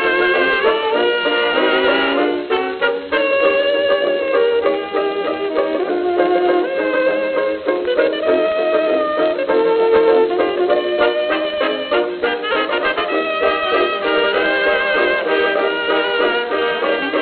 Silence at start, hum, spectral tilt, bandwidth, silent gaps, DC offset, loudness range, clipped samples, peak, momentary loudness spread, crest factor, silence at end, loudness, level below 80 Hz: 0 s; none; -7.5 dB/octave; 4.7 kHz; none; under 0.1%; 2 LU; under 0.1%; -2 dBFS; 4 LU; 14 dB; 0 s; -16 LUFS; -54 dBFS